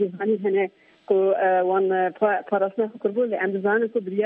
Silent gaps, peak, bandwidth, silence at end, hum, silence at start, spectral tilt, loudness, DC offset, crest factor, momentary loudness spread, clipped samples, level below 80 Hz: none; -8 dBFS; 3.7 kHz; 0 s; none; 0 s; -9.5 dB/octave; -23 LUFS; under 0.1%; 14 dB; 5 LU; under 0.1%; -78 dBFS